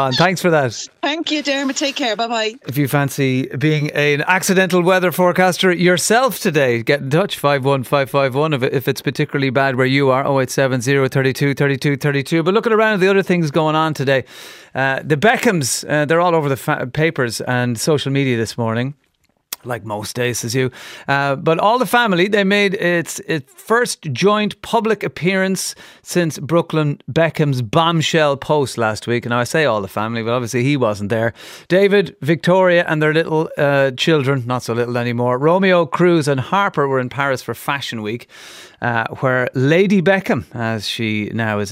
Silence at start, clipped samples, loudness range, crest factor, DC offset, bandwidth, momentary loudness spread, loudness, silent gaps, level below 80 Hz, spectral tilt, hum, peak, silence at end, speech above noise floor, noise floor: 0 s; under 0.1%; 4 LU; 16 dB; under 0.1%; 16 kHz; 8 LU; -17 LUFS; none; -58 dBFS; -5 dB/octave; none; 0 dBFS; 0 s; 46 dB; -63 dBFS